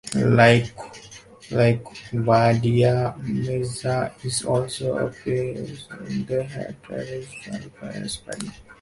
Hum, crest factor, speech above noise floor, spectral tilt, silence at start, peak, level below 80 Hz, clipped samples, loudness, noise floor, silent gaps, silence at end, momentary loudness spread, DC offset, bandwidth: none; 22 dB; 22 dB; -6 dB/octave; 0.05 s; -2 dBFS; -50 dBFS; under 0.1%; -22 LUFS; -45 dBFS; none; 0.05 s; 18 LU; under 0.1%; 11.5 kHz